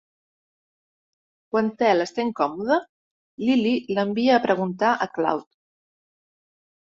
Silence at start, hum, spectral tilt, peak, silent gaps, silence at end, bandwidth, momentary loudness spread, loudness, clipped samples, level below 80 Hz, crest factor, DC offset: 1.55 s; none; -6 dB/octave; -6 dBFS; 2.89-3.38 s; 1.4 s; 7.8 kHz; 6 LU; -23 LUFS; under 0.1%; -68 dBFS; 20 dB; under 0.1%